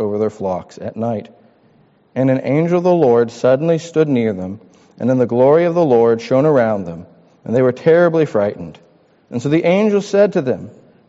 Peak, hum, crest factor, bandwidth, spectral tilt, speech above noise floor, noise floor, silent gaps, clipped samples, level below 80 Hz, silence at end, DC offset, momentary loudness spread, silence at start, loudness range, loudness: -2 dBFS; none; 14 dB; 8 kHz; -7 dB/octave; 38 dB; -53 dBFS; none; under 0.1%; -58 dBFS; 0.4 s; under 0.1%; 15 LU; 0 s; 3 LU; -15 LUFS